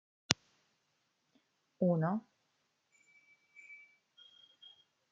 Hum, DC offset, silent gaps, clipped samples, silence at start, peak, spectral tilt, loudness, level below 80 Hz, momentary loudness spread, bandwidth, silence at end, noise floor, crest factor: none; under 0.1%; none; under 0.1%; 0.3 s; -2 dBFS; -4.5 dB/octave; -35 LUFS; -82 dBFS; 26 LU; 9.6 kHz; 1.35 s; -80 dBFS; 40 dB